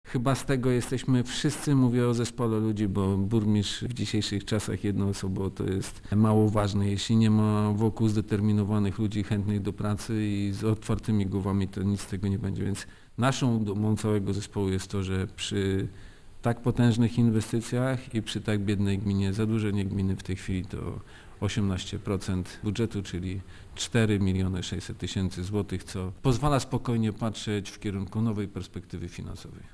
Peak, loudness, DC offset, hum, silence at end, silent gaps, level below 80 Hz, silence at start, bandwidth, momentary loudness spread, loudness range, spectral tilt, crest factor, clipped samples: -10 dBFS; -28 LUFS; under 0.1%; none; 0.05 s; none; -46 dBFS; 0.05 s; 11 kHz; 10 LU; 4 LU; -6.5 dB/octave; 18 dB; under 0.1%